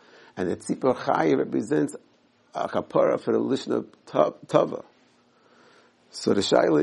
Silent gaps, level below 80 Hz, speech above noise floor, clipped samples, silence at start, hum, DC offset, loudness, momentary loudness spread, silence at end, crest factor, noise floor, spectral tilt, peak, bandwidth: none; -70 dBFS; 37 dB; under 0.1%; 0.35 s; none; under 0.1%; -25 LUFS; 10 LU; 0 s; 22 dB; -61 dBFS; -5.5 dB/octave; -4 dBFS; 11.5 kHz